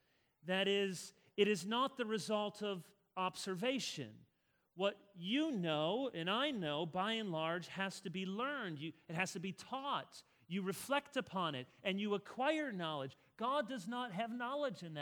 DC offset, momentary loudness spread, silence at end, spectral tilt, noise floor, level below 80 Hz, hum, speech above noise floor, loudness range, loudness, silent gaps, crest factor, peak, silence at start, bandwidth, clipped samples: under 0.1%; 9 LU; 0 s; -4.5 dB/octave; -80 dBFS; -84 dBFS; none; 40 dB; 3 LU; -40 LUFS; none; 22 dB; -18 dBFS; 0.45 s; over 20 kHz; under 0.1%